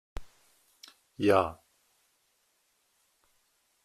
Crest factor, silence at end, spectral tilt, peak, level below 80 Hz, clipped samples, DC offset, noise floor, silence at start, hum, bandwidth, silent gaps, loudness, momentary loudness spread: 26 dB; 2.3 s; -6 dB/octave; -8 dBFS; -54 dBFS; under 0.1%; under 0.1%; -73 dBFS; 0.15 s; none; 14.5 kHz; none; -28 LUFS; 28 LU